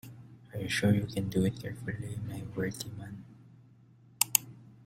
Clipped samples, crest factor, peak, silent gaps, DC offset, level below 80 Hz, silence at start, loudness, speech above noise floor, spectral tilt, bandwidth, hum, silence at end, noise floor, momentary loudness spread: under 0.1%; 34 dB; 0 dBFS; none; under 0.1%; -60 dBFS; 0.05 s; -32 LUFS; 26 dB; -4 dB/octave; 16.5 kHz; none; 0 s; -59 dBFS; 20 LU